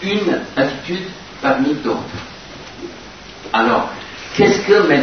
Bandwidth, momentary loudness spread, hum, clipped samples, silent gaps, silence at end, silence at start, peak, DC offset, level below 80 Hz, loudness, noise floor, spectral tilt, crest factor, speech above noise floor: 6.6 kHz; 20 LU; none; under 0.1%; none; 0 s; 0 s; 0 dBFS; 0.2%; -48 dBFS; -17 LUFS; -36 dBFS; -5 dB/octave; 18 dB; 20 dB